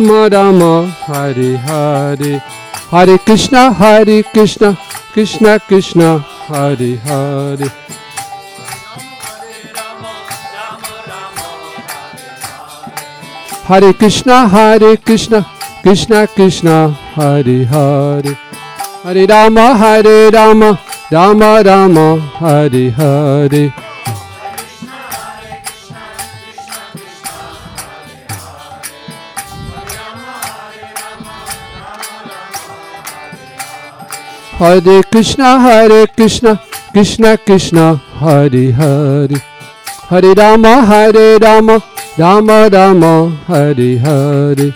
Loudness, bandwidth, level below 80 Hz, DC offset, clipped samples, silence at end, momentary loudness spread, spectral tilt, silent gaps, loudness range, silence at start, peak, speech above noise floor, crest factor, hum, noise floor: -7 LUFS; 16.5 kHz; -38 dBFS; under 0.1%; 2%; 0 s; 22 LU; -6 dB/octave; none; 19 LU; 0 s; 0 dBFS; 23 dB; 10 dB; none; -30 dBFS